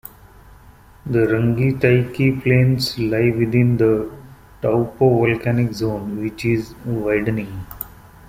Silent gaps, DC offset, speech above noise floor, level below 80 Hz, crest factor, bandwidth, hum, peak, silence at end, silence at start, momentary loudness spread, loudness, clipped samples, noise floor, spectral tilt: none; under 0.1%; 28 dB; -44 dBFS; 16 dB; 16 kHz; none; -2 dBFS; 0.4 s; 0.65 s; 15 LU; -19 LUFS; under 0.1%; -46 dBFS; -7.5 dB/octave